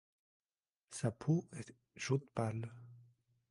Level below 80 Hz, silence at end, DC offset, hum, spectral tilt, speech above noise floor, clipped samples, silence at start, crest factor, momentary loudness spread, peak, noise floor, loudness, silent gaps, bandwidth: -74 dBFS; 0.5 s; under 0.1%; none; -6.5 dB/octave; over 51 dB; under 0.1%; 0.9 s; 22 dB; 17 LU; -20 dBFS; under -90 dBFS; -40 LUFS; none; 11.5 kHz